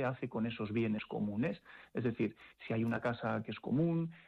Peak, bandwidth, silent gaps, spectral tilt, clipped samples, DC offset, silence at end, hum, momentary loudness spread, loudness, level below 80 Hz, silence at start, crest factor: -26 dBFS; 6 kHz; none; -9 dB/octave; under 0.1%; under 0.1%; 0.05 s; none; 6 LU; -37 LUFS; -68 dBFS; 0 s; 12 dB